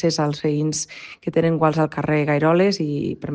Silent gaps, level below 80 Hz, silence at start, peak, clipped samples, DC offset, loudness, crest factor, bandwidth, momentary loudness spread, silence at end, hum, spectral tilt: none; -56 dBFS; 0 s; -4 dBFS; under 0.1%; under 0.1%; -20 LUFS; 16 dB; 10 kHz; 8 LU; 0 s; none; -5.5 dB/octave